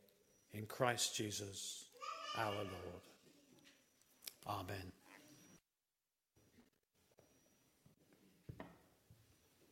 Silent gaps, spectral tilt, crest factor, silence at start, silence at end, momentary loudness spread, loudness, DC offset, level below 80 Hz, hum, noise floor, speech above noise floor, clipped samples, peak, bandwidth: none; -3 dB/octave; 30 dB; 0.5 s; 0.05 s; 23 LU; -45 LUFS; under 0.1%; -80 dBFS; none; under -90 dBFS; over 46 dB; under 0.1%; -20 dBFS; 16.5 kHz